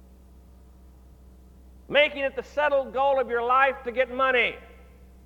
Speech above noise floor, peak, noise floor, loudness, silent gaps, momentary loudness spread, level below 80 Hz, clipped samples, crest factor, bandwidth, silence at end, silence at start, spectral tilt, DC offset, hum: 27 dB; -6 dBFS; -50 dBFS; -24 LUFS; none; 6 LU; -52 dBFS; under 0.1%; 20 dB; 7.6 kHz; 0.6 s; 1.9 s; -4.5 dB/octave; under 0.1%; none